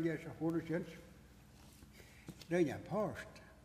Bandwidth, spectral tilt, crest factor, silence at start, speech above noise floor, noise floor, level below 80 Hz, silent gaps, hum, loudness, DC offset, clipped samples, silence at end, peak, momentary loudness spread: 15 kHz; -7 dB/octave; 18 dB; 0 s; 22 dB; -60 dBFS; -66 dBFS; none; none; -40 LUFS; under 0.1%; under 0.1%; 0.05 s; -24 dBFS; 24 LU